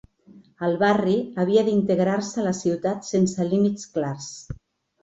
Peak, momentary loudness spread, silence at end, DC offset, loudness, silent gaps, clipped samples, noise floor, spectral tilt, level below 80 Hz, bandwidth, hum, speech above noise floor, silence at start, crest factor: -6 dBFS; 14 LU; 0.5 s; under 0.1%; -23 LUFS; none; under 0.1%; -52 dBFS; -6 dB/octave; -54 dBFS; 8 kHz; none; 29 dB; 0.35 s; 16 dB